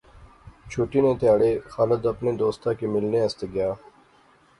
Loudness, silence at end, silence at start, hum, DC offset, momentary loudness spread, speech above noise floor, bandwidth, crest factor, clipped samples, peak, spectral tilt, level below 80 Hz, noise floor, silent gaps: -24 LUFS; 0.8 s; 0.2 s; none; under 0.1%; 9 LU; 35 dB; 11 kHz; 18 dB; under 0.1%; -8 dBFS; -7.5 dB/octave; -50 dBFS; -57 dBFS; none